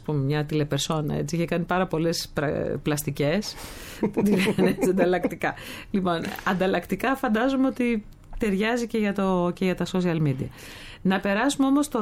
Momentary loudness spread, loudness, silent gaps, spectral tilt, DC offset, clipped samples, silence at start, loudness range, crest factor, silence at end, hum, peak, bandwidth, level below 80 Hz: 8 LU; -25 LUFS; none; -5.5 dB/octave; under 0.1%; under 0.1%; 0 s; 2 LU; 18 dB; 0 s; none; -8 dBFS; 16.5 kHz; -46 dBFS